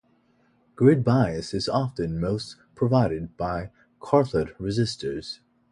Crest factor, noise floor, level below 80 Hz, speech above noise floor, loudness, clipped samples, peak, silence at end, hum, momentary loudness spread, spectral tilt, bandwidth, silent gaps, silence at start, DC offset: 20 dB; -64 dBFS; -48 dBFS; 40 dB; -25 LUFS; under 0.1%; -6 dBFS; 0.35 s; none; 15 LU; -7 dB/octave; 11 kHz; none; 0.8 s; under 0.1%